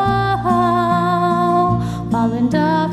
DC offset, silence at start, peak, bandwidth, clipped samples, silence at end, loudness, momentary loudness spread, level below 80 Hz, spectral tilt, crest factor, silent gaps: under 0.1%; 0 s; -4 dBFS; 12.5 kHz; under 0.1%; 0 s; -16 LUFS; 3 LU; -38 dBFS; -7.5 dB/octave; 12 dB; none